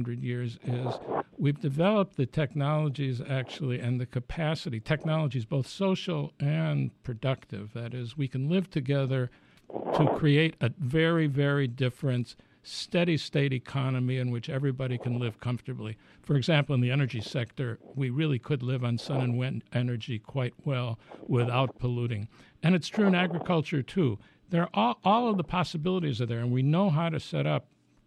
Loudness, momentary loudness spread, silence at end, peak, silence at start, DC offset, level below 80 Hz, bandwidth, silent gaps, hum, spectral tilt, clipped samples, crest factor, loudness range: -29 LUFS; 10 LU; 0.45 s; -10 dBFS; 0 s; under 0.1%; -58 dBFS; 10.5 kHz; none; none; -7.5 dB/octave; under 0.1%; 18 dB; 4 LU